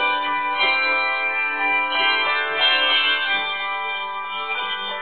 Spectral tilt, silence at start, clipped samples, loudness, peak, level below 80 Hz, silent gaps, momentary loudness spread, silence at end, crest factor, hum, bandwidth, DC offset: -4 dB/octave; 0 s; under 0.1%; -19 LUFS; -6 dBFS; -70 dBFS; none; 9 LU; 0 s; 14 dB; none; 4.7 kHz; 0.6%